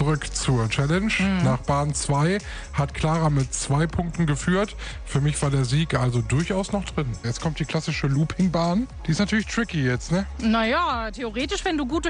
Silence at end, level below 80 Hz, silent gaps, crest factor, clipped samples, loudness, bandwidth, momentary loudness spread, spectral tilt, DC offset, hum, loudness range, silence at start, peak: 0 s; -36 dBFS; none; 16 dB; under 0.1%; -24 LUFS; 10.5 kHz; 6 LU; -5.5 dB/octave; under 0.1%; none; 2 LU; 0 s; -8 dBFS